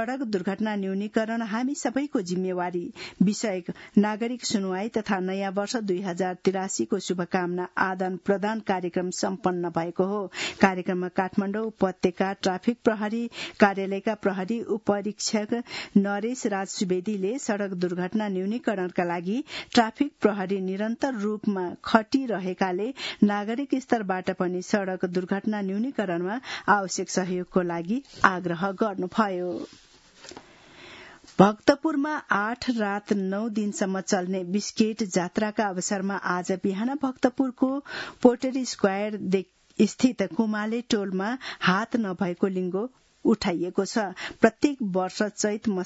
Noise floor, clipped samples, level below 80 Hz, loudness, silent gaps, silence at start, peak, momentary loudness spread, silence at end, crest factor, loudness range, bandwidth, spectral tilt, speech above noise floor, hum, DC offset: -50 dBFS; under 0.1%; -64 dBFS; -26 LUFS; none; 0 s; 0 dBFS; 6 LU; 0 s; 26 dB; 2 LU; 8 kHz; -5 dB/octave; 24 dB; none; under 0.1%